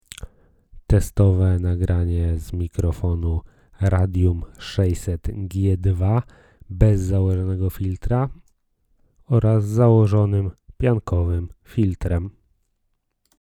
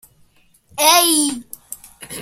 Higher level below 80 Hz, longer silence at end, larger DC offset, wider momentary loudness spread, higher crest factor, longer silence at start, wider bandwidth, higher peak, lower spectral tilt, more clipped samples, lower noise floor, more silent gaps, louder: first, -32 dBFS vs -60 dBFS; first, 1.1 s vs 0 s; neither; second, 11 LU vs 22 LU; about the same, 20 dB vs 20 dB; second, 0.2 s vs 0.75 s; second, 14 kHz vs 16.5 kHz; about the same, 0 dBFS vs 0 dBFS; first, -8.5 dB/octave vs 0 dB/octave; neither; first, -71 dBFS vs -55 dBFS; neither; second, -21 LUFS vs -13 LUFS